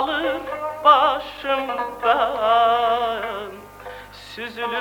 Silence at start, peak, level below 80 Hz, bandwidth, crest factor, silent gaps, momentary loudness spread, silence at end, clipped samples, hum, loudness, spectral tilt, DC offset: 0 s; -2 dBFS; -52 dBFS; 18 kHz; 20 dB; none; 21 LU; 0 s; under 0.1%; 50 Hz at -55 dBFS; -20 LUFS; -4 dB/octave; under 0.1%